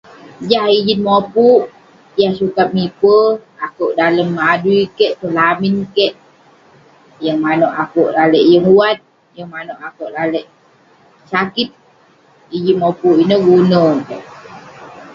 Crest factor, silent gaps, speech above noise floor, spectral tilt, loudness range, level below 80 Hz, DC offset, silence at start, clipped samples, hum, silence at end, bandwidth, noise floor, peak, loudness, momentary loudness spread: 14 dB; none; 37 dB; -7.5 dB/octave; 6 LU; -56 dBFS; under 0.1%; 0.4 s; under 0.1%; none; 0 s; 7.2 kHz; -49 dBFS; 0 dBFS; -13 LUFS; 16 LU